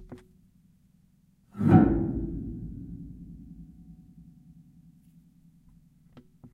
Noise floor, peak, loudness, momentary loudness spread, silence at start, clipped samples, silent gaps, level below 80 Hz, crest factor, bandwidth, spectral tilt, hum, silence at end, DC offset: -63 dBFS; -6 dBFS; -25 LUFS; 29 LU; 0 s; under 0.1%; none; -46 dBFS; 24 dB; 4.2 kHz; -11 dB/octave; none; 0.05 s; under 0.1%